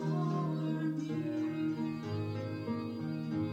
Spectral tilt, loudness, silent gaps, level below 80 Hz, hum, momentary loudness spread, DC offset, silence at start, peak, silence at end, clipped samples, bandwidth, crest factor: -8.5 dB/octave; -36 LUFS; none; -72 dBFS; none; 5 LU; under 0.1%; 0 s; -24 dBFS; 0 s; under 0.1%; 8.2 kHz; 12 dB